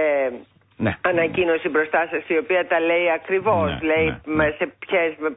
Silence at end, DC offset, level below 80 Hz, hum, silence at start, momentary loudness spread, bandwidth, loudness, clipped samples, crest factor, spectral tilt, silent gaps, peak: 0 s; under 0.1%; -46 dBFS; none; 0 s; 4 LU; 4 kHz; -21 LUFS; under 0.1%; 14 dB; -10.5 dB/octave; none; -8 dBFS